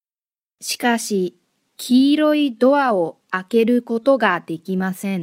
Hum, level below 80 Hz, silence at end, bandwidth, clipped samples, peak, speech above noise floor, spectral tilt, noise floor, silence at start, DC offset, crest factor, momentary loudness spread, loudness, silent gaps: none; -70 dBFS; 0 s; 16 kHz; under 0.1%; 0 dBFS; over 72 dB; -5 dB/octave; under -90 dBFS; 0.6 s; under 0.1%; 18 dB; 11 LU; -19 LUFS; none